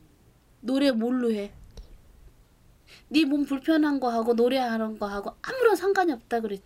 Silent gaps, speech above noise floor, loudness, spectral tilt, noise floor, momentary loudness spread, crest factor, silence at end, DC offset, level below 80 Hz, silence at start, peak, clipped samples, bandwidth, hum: none; 34 dB; -25 LUFS; -5 dB/octave; -58 dBFS; 9 LU; 18 dB; 0.05 s; under 0.1%; -56 dBFS; 0.65 s; -8 dBFS; under 0.1%; 16 kHz; none